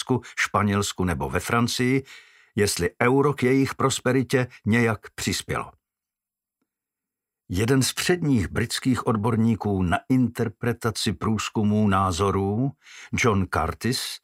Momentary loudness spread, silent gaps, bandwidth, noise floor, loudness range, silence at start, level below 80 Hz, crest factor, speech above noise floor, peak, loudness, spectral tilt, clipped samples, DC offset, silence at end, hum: 6 LU; none; 16 kHz; -89 dBFS; 4 LU; 0 s; -48 dBFS; 20 dB; 66 dB; -4 dBFS; -24 LUFS; -5 dB/octave; under 0.1%; under 0.1%; 0.05 s; none